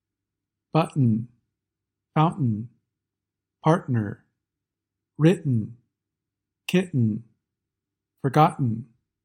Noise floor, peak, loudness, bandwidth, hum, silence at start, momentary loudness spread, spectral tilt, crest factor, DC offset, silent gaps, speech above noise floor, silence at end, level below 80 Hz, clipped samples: -87 dBFS; -4 dBFS; -24 LUFS; 13.5 kHz; none; 0.75 s; 14 LU; -8 dB/octave; 22 dB; under 0.1%; none; 65 dB; 0.4 s; -68 dBFS; under 0.1%